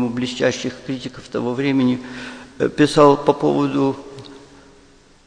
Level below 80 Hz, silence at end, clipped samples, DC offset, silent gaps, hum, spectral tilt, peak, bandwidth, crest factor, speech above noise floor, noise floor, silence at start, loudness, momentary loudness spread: -52 dBFS; 0.9 s; under 0.1%; under 0.1%; none; none; -6 dB/octave; 0 dBFS; 10 kHz; 20 dB; 31 dB; -50 dBFS; 0 s; -19 LUFS; 19 LU